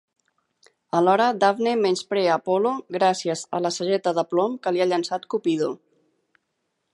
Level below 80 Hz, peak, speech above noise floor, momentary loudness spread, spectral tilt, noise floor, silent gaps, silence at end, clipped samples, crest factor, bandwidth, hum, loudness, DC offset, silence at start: -76 dBFS; -4 dBFS; 54 dB; 7 LU; -4.5 dB/octave; -76 dBFS; none; 1.2 s; under 0.1%; 18 dB; 11.5 kHz; none; -23 LUFS; under 0.1%; 0.95 s